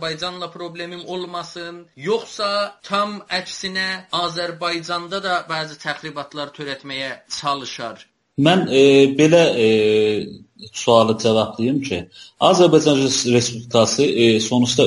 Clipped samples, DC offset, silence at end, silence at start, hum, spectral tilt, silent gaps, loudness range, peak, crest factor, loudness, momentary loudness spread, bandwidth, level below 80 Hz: under 0.1%; under 0.1%; 0 s; 0 s; none; -4.5 dB/octave; none; 9 LU; 0 dBFS; 18 dB; -18 LUFS; 17 LU; 11.5 kHz; -58 dBFS